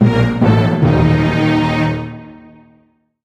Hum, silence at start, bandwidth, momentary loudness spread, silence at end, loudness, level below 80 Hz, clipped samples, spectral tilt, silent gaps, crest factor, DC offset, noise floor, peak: none; 0 s; 8.6 kHz; 11 LU; 0.9 s; -14 LUFS; -32 dBFS; under 0.1%; -8 dB/octave; none; 14 dB; under 0.1%; -55 dBFS; 0 dBFS